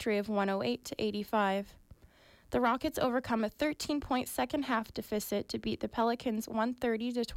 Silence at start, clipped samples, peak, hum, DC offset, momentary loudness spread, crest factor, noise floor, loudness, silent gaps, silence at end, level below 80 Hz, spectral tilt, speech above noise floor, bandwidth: 0 s; under 0.1%; -20 dBFS; none; under 0.1%; 5 LU; 14 dB; -61 dBFS; -33 LUFS; none; 0 s; -58 dBFS; -4.5 dB/octave; 28 dB; 16.5 kHz